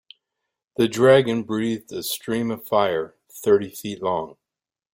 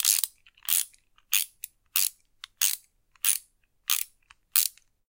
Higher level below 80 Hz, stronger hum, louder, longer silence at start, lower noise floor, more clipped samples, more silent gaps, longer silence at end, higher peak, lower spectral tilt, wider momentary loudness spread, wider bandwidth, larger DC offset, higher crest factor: first, -62 dBFS vs -72 dBFS; neither; first, -22 LUFS vs -26 LUFS; first, 0.8 s vs 0 s; first, -82 dBFS vs -60 dBFS; neither; neither; first, 0.65 s vs 0.4 s; about the same, -2 dBFS vs -2 dBFS; first, -5 dB/octave vs 6.5 dB/octave; about the same, 13 LU vs 13 LU; about the same, 17 kHz vs 17.5 kHz; neither; second, 20 dB vs 28 dB